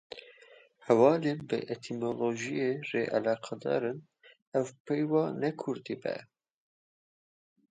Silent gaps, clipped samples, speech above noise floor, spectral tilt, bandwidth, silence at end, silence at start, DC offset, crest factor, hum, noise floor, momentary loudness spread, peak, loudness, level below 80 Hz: 4.42-4.52 s, 4.80-4.85 s; under 0.1%; 28 dB; -6.5 dB/octave; 9.2 kHz; 1.5 s; 0.1 s; under 0.1%; 22 dB; none; -58 dBFS; 13 LU; -10 dBFS; -31 LUFS; -78 dBFS